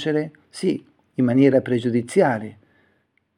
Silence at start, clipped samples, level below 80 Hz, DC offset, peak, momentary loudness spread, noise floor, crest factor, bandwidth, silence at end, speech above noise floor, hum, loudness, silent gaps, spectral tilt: 0 s; under 0.1%; -66 dBFS; under 0.1%; -4 dBFS; 16 LU; -66 dBFS; 18 dB; 11.5 kHz; 0.85 s; 47 dB; none; -21 LUFS; none; -7 dB/octave